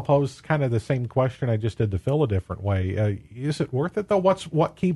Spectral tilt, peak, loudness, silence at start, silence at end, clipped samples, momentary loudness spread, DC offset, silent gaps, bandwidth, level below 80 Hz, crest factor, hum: -8 dB/octave; -6 dBFS; -25 LUFS; 0 s; 0 s; under 0.1%; 5 LU; under 0.1%; none; 11.5 kHz; -50 dBFS; 18 dB; none